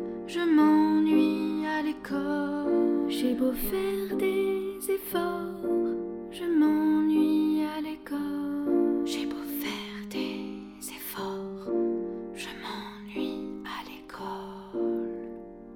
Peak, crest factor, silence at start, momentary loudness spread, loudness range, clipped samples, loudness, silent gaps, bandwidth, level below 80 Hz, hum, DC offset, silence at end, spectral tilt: -12 dBFS; 16 dB; 0 s; 14 LU; 8 LU; under 0.1%; -29 LUFS; none; 18.5 kHz; -56 dBFS; none; under 0.1%; 0 s; -5 dB/octave